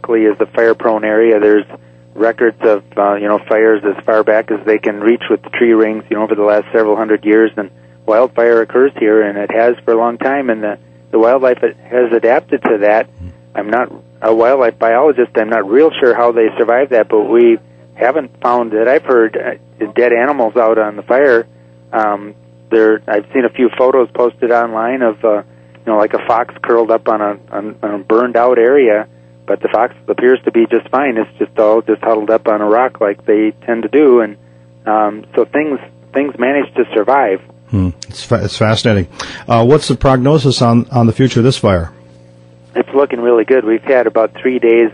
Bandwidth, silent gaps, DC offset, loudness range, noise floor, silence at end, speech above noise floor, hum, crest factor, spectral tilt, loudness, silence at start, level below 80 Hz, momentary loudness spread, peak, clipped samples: 10.5 kHz; none; under 0.1%; 3 LU; -41 dBFS; 0 s; 29 dB; 60 Hz at -40 dBFS; 12 dB; -7 dB/octave; -12 LUFS; 0.05 s; -42 dBFS; 8 LU; 0 dBFS; under 0.1%